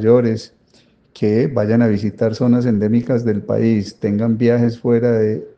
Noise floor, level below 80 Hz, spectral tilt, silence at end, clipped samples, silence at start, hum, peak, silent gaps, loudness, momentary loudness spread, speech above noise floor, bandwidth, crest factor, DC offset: -54 dBFS; -54 dBFS; -9 dB/octave; 0.1 s; under 0.1%; 0 s; none; 0 dBFS; none; -17 LUFS; 5 LU; 38 dB; 7.6 kHz; 16 dB; under 0.1%